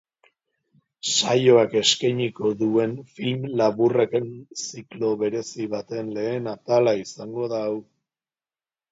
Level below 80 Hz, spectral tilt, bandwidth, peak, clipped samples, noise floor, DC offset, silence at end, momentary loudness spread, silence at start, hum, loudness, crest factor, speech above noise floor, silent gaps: -68 dBFS; -4 dB/octave; 7.8 kHz; -4 dBFS; under 0.1%; under -90 dBFS; under 0.1%; 1.1 s; 13 LU; 1.05 s; none; -23 LUFS; 20 dB; over 67 dB; none